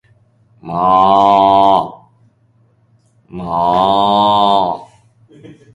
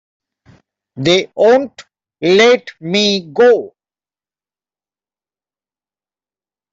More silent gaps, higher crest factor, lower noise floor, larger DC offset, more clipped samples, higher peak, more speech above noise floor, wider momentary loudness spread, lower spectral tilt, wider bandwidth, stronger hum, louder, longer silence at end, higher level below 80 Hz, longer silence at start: neither; about the same, 14 dB vs 14 dB; second, -54 dBFS vs under -90 dBFS; neither; neither; about the same, 0 dBFS vs -2 dBFS; second, 44 dB vs over 78 dB; first, 17 LU vs 10 LU; first, -6.5 dB/octave vs -4.5 dB/octave; first, 10.5 kHz vs 7.8 kHz; second, none vs 50 Hz at -45 dBFS; about the same, -12 LUFS vs -13 LUFS; second, 0.2 s vs 3.05 s; first, -48 dBFS vs -60 dBFS; second, 0.65 s vs 0.95 s